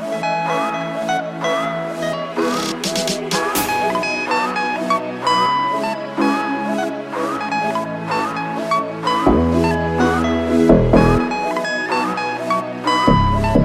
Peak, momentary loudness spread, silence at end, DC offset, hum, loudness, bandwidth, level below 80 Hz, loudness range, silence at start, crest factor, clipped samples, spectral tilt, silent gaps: 0 dBFS; 8 LU; 0 s; under 0.1%; none; -18 LUFS; 16 kHz; -34 dBFS; 4 LU; 0 s; 18 dB; under 0.1%; -5 dB/octave; none